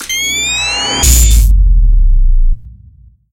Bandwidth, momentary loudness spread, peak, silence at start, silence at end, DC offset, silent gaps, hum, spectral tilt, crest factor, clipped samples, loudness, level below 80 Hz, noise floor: 17.5 kHz; 9 LU; 0 dBFS; 0 s; 0.65 s; under 0.1%; none; none; -2 dB/octave; 8 dB; 0.2%; -11 LUFS; -10 dBFS; -41 dBFS